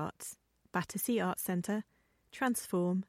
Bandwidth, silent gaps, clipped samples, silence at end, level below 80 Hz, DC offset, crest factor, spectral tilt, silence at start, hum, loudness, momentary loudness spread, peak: 16.5 kHz; none; under 0.1%; 0.05 s; -72 dBFS; under 0.1%; 16 dB; -5 dB/octave; 0 s; none; -35 LUFS; 17 LU; -20 dBFS